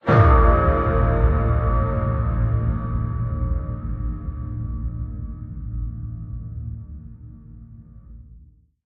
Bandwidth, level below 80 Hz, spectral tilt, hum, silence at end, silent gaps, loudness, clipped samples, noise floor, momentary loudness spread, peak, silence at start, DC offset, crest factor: 4.6 kHz; -26 dBFS; -8.5 dB/octave; none; 0.4 s; none; -22 LUFS; under 0.1%; -50 dBFS; 21 LU; -2 dBFS; 0.05 s; under 0.1%; 18 dB